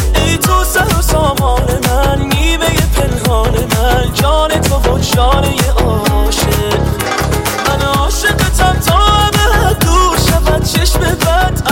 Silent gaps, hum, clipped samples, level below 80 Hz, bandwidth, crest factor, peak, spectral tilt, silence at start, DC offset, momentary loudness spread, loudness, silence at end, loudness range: none; none; under 0.1%; -16 dBFS; 17 kHz; 10 dB; 0 dBFS; -4.5 dB/octave; 0 s; under 0.1%; 3 LU; -12 LUFS; 0 s; 2 LU